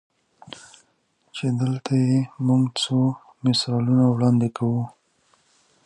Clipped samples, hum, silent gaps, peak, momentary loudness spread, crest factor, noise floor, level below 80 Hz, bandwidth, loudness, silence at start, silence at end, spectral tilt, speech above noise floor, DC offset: under 0.1%; none; none; -8 dBFS; 18 LU; 16 dB; -66 dBFS; -62 dBFS; 11 kHz; -22 LUFS; 1.35 s; 0.95 s; -6.5 dB/octave; 46 dB; under 0.1%